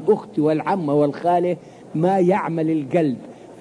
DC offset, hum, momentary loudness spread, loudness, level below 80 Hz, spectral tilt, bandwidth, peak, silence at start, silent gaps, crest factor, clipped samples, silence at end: under 0.1%; none; 11 LU; -20 LUFS; -68 dBFS; -8.5 dB/octave; 10.5 kHz; -6 dBFS; 0 s; none; 14 dB; under 0.1%; 0.05 s